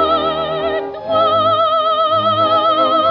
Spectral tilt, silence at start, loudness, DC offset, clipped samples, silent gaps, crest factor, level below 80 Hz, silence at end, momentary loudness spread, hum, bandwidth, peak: -2 dB/octave; 0 s; -14 LUFS; under 0.1%; under 0.1%; none; 12 dB; -48 dBFS; 0 s; 6 LU; none; 6 kHz; -2 dBFS